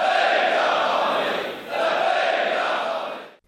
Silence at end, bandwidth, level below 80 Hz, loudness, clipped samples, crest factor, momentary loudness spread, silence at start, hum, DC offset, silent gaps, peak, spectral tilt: 0.2 s; 15 kHz; -72 dBFS; -21 LUFS; under 0.1%; 14 dB; 9 LU; 0 s; none; under 0.1%; none; -8 dBFS; -2.5 dB/octave